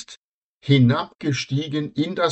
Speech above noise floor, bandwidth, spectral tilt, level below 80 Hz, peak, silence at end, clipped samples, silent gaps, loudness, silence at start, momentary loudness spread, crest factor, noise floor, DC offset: 37 dB; 8.2 kHz; -6.5 dB/octave; -58 dBFS; -4 dBFS; 0 s; under 0.1%; 0.17-0.61 s, 1.15-1.19 s; -21 LUFS; 0 s; 12 LU; 18 dB; -57 dBFS; under 0.1%